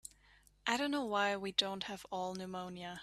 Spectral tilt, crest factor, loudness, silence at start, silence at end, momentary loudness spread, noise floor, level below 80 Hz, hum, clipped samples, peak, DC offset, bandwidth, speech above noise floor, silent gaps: -3.5 dB/octave; 24 dB; -37 LUFS; 0.05 s; 0 s; 10 LU; -67 dBFS; -72 dBFS; 50 Hz at -70 dBFS; under 0.1%; -16 dBFS; under 0.1%; 14 kHz; 29 dB; none